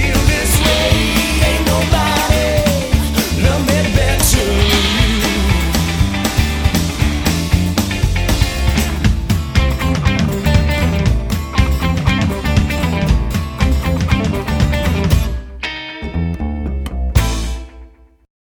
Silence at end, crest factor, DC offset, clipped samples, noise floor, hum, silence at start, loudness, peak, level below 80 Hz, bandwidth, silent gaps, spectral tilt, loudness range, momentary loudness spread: 0.7 s; 14 dB; under 0.1%; under 0.1%; -40 dBFS; none; 0 s; -15 LUFS; 0 dBFS; -18 dBFS; over 20 kHz; none; -4.5 dB/octave; 5 LU; 8 LU